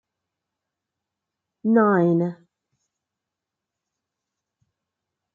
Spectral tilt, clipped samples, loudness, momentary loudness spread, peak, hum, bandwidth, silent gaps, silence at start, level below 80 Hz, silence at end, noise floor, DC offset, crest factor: -11 dB/octave; under 0.1%; -20 LUFS; 12 LU; -6 dBFS; none; 4.2 kHz; none; 1.65 s; -78 dBFS; 3 s; -86 dBFS; under 0.1%; 20 dB